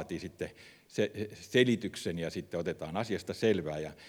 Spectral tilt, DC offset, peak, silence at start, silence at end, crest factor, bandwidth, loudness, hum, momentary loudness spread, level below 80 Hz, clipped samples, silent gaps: -5.5 dB/octave; under 0.1%; -12 dBFS; 0 s; 0 s; 22 dB; 18.5 kHz; -34 LUFS; none; 13 LU; -62 dBFS; under 0.1%; none